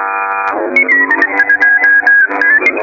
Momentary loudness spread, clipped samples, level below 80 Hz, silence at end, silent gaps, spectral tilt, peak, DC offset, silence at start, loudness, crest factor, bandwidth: 8 LU; under 0.1%; -58 dBFS; 0 s; none; -3.5 dB/octave; 0 dBFS; under 0.1%; 0 s; -8 LUFS; 10 dB; 7.2 kHz